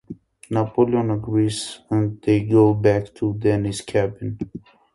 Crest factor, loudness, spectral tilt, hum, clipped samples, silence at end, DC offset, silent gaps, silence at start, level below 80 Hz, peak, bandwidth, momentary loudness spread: 18 dB; -21 LUFS; -7 dB/octave; none; under 0.1%; 0.35 s; under 0.1%; none; 0.1 s; -48 dBFS; -2 dBFS; 11.5 kHz; 15 LU